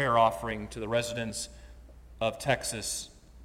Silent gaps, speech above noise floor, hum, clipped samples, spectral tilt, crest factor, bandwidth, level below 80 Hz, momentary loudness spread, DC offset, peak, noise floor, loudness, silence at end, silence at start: none; 20 dB; none; under 0.1%; -3.5 dB/octave; 22 dB; 16.5 kHz; -52 dBFS; 11 LU; under 0.1%; -10 dBFS; -50 dBFS; -31 LUFS; 0 s; 0 s